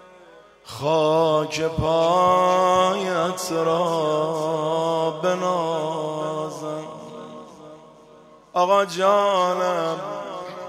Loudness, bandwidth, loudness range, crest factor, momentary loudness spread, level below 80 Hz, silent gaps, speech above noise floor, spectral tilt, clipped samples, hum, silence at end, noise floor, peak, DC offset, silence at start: -21 LUFS; 15.5 kHz; 7 LU; 16 dB; 14 LU; -52 dBFS; none; 28 dB; -5 dB/octave; under 0.1%; none; 0 s; -49 dBFS; -6 dBFS; under 0.1%; 0.35 s